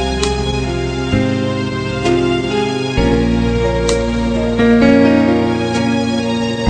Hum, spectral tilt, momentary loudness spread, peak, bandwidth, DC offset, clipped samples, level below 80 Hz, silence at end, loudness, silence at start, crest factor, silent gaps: none; -6 dB/octave; 8 LU; 0 dBFS; 10 kHz; under 0.1%; under 0.1%; -26 dBFS; 0 s; -15 LUFS; 0 s; 14 dB; none